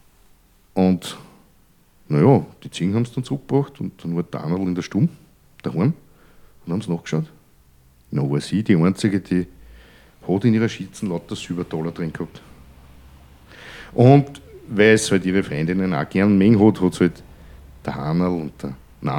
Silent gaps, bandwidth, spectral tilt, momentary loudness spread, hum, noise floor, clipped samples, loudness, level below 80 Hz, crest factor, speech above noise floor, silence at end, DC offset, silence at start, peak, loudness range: none; 14.5 kHz; -7 dB/octave; 18 LU; none; -55 dBFS; under 0.1%; -20 LUFS; -50 dBFS; 20 dB; 36 dB; 0 s; under 0.1%; 0.75 s; 0 dBFS; 8 LU